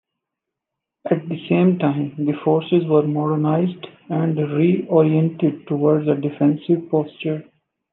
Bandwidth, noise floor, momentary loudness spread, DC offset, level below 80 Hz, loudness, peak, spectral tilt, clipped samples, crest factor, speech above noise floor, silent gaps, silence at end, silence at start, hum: 4.1 kHz; -83 dBFS; 9 LU; under 0.1%; -72 dBFS; -19 LUFS; -4 dBFS; -11.5 dB/octave; under 0.1%; 16 dB; 64 dB; none; 0.5 s; 1.05 s; none